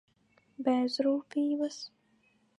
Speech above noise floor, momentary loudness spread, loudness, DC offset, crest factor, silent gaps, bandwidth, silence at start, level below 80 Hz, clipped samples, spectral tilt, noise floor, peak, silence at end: 39 dB; 12 LU; -31 LUFS; under 0.1%; 18 dB; none; 11 kHz; 0.6 s; -88 dBFS; under 0.1%; -4 dB/octave; -69 dBFS; -16 dBFS; 0.7 s